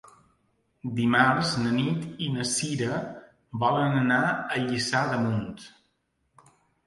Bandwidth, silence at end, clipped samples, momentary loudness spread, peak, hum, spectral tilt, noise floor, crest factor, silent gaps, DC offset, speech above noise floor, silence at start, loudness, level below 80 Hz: 11.5 kHz; 1.2 s; under 0.1%; 18 LU; -6 dBFS; none; -4.5 dB/octave; -73 dBFS; 22 dB; none; under 0.1%; 48 dB; 0.85 s; -26 LUFS; -60 dBFS